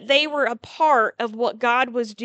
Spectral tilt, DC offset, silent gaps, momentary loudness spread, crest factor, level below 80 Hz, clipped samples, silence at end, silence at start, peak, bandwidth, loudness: -3 dB/octave; under 0.1%; none; 7 LU; 18 dB; -70 dBFS; under 0.1%; 0 s; 0 s; -4 dBFS; 8.8 kHz; -21 LUFS